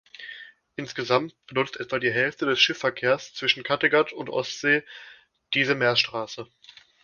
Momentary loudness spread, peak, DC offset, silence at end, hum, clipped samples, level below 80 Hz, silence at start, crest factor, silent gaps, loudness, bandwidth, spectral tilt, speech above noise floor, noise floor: 19 LU; -6 dBFS; under 0.1%; 0.6 s; none; under 0.1%; -68 dBFS; 0.2 s; 20 dB; none; -24 LUFS; 7.2 kHz; -3.5 dB/octave; 19 dB; -44 dBFS